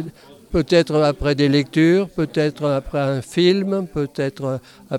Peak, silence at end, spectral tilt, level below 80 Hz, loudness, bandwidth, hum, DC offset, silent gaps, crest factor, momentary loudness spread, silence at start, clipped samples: -2 dBFS; 0 s; -6.5 dB/octave; -42 dBFS; -19 LUFS; 13.5 kHz; none; under 0.1%; none; 16 dB; 9 LU; 0 s; under 0.1%